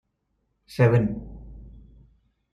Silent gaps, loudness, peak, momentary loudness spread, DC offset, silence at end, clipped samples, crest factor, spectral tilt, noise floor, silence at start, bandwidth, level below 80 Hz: none; -22 LUFS; -8 dBFS; 25 LU; under 0.1%; 0.9 s; under 0.1%; 20 dB; -9 dB/octave; -74 dBFS; 0.7 s; 11.5 kHz; -46 dBFS